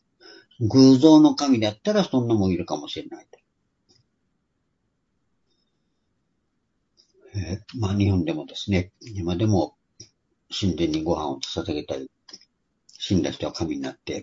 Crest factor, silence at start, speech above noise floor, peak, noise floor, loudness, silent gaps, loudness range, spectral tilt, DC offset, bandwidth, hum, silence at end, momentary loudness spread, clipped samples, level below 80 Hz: 22 dB; 0.6 s; 52 dB; -2 dBFS; -74 dBFS; -22 LUFS; none; 17 LU; -6.5 dB/octave; under 0.1%; 7.6 kHz; none; 0 s; 19 LU; under 0.1%; -54 dBFS